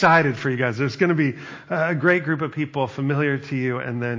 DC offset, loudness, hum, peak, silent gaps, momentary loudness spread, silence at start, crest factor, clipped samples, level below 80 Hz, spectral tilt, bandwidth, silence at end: under 0.1%; -22 LUFS; none; -2 dBFS; none; 7 LU; 0 s; 18 dB; under 0.1%; -62 dBFS; -7.5 dB/octave; 7.6 kHz; 0 s